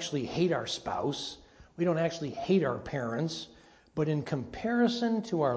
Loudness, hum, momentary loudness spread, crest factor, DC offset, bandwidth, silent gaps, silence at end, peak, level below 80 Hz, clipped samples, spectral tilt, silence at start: -31 LUFS; none; 10 LU; 16 dB; under 0.1%; 8 kHz; none; 0 s; -14 dBFS; -60 dBFS; under 0.1%; -6 dB/octave; 0 s